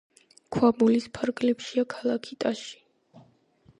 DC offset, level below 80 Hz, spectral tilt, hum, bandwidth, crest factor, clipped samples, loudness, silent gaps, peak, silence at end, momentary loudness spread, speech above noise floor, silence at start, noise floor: under 0.1%; -64 dBFS; -5.5 dB/octave; none; 10.5 kHz; 20 dB; under 0.1%; -26 LUFS; none; -8 dBFS; 0.6 s; 11 LU; 36 dB; 0.5 s; -61 dBFS